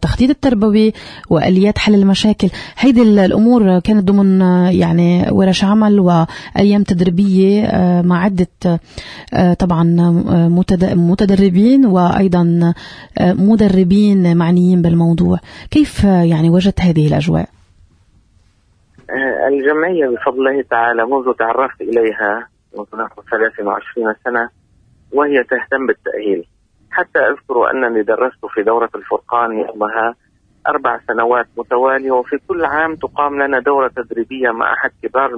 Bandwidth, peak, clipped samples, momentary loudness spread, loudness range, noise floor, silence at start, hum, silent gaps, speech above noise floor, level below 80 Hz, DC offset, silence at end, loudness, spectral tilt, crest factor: 10.5 kHz; -2 dBFS; under 0.1%; 9 LU; 6 LU; -54 dBFS; 0 s; none; none; 41 dB; -38 dBFS; under 0.1%; 0 s; -13 LUFS; -7.5 dB/octave; 12 dB